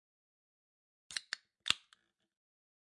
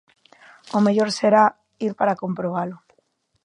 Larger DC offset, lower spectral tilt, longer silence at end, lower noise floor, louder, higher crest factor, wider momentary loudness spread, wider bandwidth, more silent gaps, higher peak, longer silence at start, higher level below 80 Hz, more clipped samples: neither; second, 1 dB/octave vs -6 dB/octave; first, 1.2 s vs 0.7 s; first, -72 dBFS vs -67 dBFS; second, -39 LUFS vs -21 LUFS; first, 36 dB vs 20 dB; second, 9 LU vs 12 LU; about the same, 11.5 kHz vs 10.5 kHz; neither; second, -10 dBFS vs -2 dBFS; first, 1.1 s vs 0.75 s; second, -84 dBFS vs -70 dBFS; neither